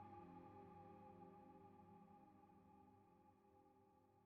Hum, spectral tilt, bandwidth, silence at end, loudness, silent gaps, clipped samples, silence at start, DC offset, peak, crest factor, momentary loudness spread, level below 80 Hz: none; -7.5 dB/octave; 4.2 kHz; 0 s; -64 LUFS; none; under 0.1%; 0 s; under 0.1%; -50 dBFS; 14 dB; 7 LU; -88 dBFS